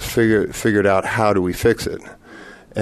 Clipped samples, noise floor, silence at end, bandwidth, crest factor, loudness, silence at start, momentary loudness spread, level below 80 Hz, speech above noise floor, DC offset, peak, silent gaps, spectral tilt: under 0.1%; -41 dBFS; 0 s; 13.5 kHz; 16 dB; -18 LUFS; 0 s; 11 LU; -42 dBFS; 23 dB; under 0.1%; -2 dBFS; none; -5.5 dB/octave